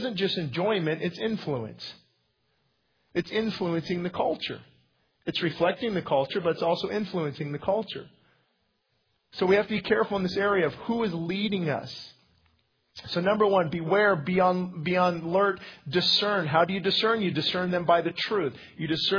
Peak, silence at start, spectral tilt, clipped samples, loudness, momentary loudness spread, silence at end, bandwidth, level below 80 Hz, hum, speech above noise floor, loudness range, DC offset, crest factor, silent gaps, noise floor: -8 dBFS; 0 s; -6.5 dB/octave; under 0.1%; -27 LUFS; 10 LU; 0 s; 5.4 kHz; -62 dBFS; none; 47 dB; 7 LU; under 0.1%; 20 dB; none; -73 dBFS